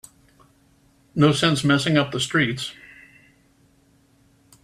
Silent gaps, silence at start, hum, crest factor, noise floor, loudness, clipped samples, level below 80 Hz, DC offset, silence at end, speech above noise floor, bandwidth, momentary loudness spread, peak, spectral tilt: none; 1.15 s; none; 20 dB; -59 dBFS; -21 LUFS; under 0.1%; -58 dBFS; under 0.1%; 1.9 s; 39 dB; 14 kHz; 15 LU; -4 dBFS; -5 dB/octave